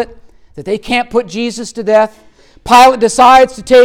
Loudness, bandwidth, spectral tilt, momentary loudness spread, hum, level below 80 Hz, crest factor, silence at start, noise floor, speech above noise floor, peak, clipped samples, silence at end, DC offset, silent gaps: -10 LUFS; 17.5 kHz; -3 dB/octave; 15 LU; none; -40 dBFS; 10 dB; 0 s; -37 dBFS; 28 dB; 0 dBFS; under 0.1%; 0 s; under 0.1%; none